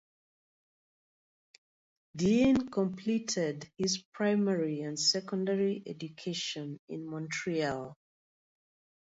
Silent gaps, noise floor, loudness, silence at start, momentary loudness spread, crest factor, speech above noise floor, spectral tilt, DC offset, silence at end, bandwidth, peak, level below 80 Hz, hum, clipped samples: 4.05-4.12 s, 6.79-6.88 s; under -90 dBFS; -32 LUFS; 2.15 s; 13 LU; 18 dB; over 58 dB; -4.5 dB/octave; under 0.1%; 1.1 s; 8 kHz; -16 dBFS; -66 dBFS; none; under 0.1%